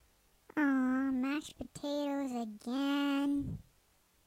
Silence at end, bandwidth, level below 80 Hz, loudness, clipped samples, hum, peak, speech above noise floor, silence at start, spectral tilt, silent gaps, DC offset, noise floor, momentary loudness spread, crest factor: 0.65 s; 15 kHz; -62 dBFS; -35 LUFS; under 0.1%; none; -20 dBFS; 35 dB; 0.55 s; -5 dB/octave; none; under 0.1%; -70 dBFS; 11 LU; 14 dB